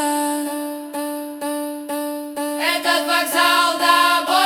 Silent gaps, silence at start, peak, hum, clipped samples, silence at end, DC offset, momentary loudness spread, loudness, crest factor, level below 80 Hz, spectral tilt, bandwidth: none; 0 s; -2 dBFS; none; under 0.1%; 0 s; under 0.1%; 12 LU; -19 LUFS; 18 dB; -70 dBFS; 0 dB/octave; 18 kHz